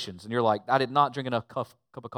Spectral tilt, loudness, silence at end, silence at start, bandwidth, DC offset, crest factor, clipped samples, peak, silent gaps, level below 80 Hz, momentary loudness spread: -6 dB/octave; -27 LUFS; 0 s; 0 s; 14.5 kHz; under 0.1%; 20 dB; under 0.1%; -8 dBFS; none; -74 dBFS; 13 LU